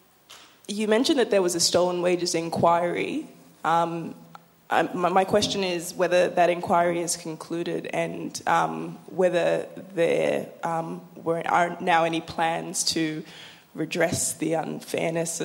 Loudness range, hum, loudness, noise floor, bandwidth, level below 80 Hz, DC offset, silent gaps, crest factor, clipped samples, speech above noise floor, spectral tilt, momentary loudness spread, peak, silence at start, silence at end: 3 LU; none; -25 LUFS; -51 dBFS; 16.5 kHz; -64 dBFS; under 0.1%; none; 20 dB; under 0.1%; 26 dB; -3.5 dB/octave; 12 LU; -6 dBFS; 0.3 s; 0 s